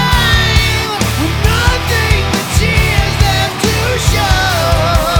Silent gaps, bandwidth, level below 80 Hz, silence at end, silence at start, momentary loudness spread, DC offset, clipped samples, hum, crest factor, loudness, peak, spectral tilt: none; over 20 kHz; -18 dBFS; 0 s; 0 s; 4 LU; under 0.1%; under 0.1%; none; 12 dB; -12 LUFS; 0 dBFS; -4 dB/octave